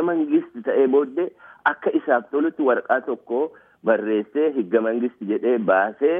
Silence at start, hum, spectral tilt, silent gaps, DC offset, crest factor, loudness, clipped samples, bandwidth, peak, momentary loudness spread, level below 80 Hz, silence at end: 0 s; none; -9 dB/octave; none; under 0.1%; 16 dB; -22 LUFS; under 0.1%; 3.7 kHz; -4 dBFS; 7 LU; -78 dBFS; 0 s